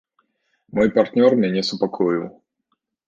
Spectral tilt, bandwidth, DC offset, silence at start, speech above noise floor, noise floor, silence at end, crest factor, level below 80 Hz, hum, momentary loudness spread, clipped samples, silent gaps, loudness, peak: -6.5 dB/octave; 7.8 kHz; under 0.1%; 0.75 s; 55 dB; -73 dBFS; 0.75 s; 18 dB; -58 dBFS; none; 10 LU; under 0.1%; none; -19 LUFS; -2 dBFS